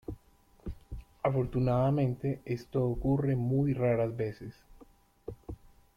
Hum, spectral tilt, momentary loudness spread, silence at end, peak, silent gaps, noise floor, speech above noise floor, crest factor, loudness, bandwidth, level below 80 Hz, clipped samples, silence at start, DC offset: none; -10 dB/octave; 20 LU; 0.45 s; -16 dBFS; none; -62 dBFS; 33 dB; 16 dB; -31 LUFS; 6.6 kHz; -50 dBFS; under 0.1%; 0.1 s; under 0.1%